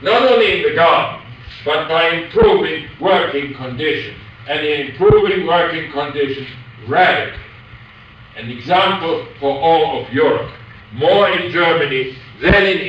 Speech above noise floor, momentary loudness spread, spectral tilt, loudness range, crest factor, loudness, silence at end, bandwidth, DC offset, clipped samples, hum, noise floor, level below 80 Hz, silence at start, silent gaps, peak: 26 dB; 16 LU; -6.5 dB/octave; 3 LU; 14 dB; -15 LUFS; 0 s; 8 kHz; under 0.1%; under 0.1%; none; -40 dBFS; -38 dBFS; 0 s; none; -2 dBFS